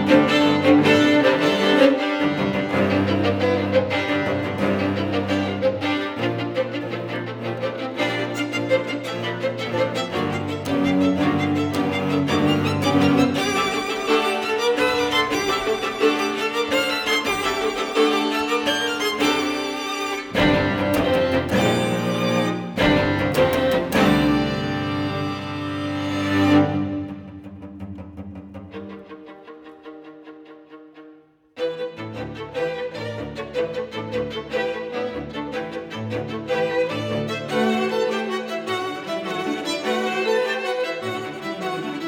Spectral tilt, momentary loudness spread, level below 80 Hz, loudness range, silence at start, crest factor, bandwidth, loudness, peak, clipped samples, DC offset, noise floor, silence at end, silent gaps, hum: -5 dB/octave; 13 LU; -48 dBFS; 11 LU; 0 s; 20 dB; 19 kHz; -21 LUFS; -2 dBFS; under 0.1%; under 0.1%; -50 dBFS; 0 s; none; none